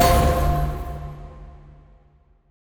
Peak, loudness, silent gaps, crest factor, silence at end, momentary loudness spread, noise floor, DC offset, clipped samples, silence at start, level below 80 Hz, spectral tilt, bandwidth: -4 dBFS; -22 LUFS; none; 18 dB; 1.1 s; 25 LU; -56 dBFS; under 0.1%; under 0.1%; 0 s; -28 dBFS; -5.5 dB/octave; over 20 kHz